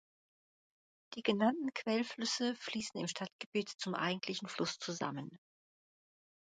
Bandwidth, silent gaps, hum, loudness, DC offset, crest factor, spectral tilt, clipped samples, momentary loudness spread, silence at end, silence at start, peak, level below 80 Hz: 9.4 kHz; 3.32-3.39 s, 3.46-3.52 s, 3.75-3.79 s; none; -38 LUFS; under 0.1%; 22 dB; -4 dB/octave; under 0.1%; 8 LU; 1.2 s; 1.1 s; -18 dBFS; -82 dBFS